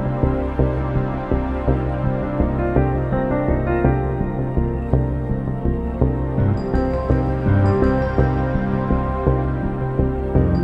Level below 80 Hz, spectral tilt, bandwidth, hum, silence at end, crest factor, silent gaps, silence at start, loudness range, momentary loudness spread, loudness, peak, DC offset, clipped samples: -24 dBFS; -10.5 dB/octave; 5.2 kHz; none; 0 s; 18 dB; none; 0 s; 2 LU; 4 LU; -20 LUFS; 0 dBFS; under 0.1%; under 0.1%